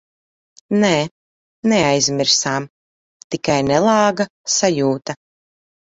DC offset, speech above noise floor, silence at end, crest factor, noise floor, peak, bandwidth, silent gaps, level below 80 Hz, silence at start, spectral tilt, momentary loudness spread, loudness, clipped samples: under 0.1%; over 73 dB; 0.7 s; 18 dB; under -90 dBFS; -2 dBFS; 8 kHz; 1.11-1.63 s, 2.70-3.30 s, 4.30-4.44 s; -56 dBFS; 0.7 s; -3.5 dB/octave; 13 LU; -17 LUFS; under 0.1%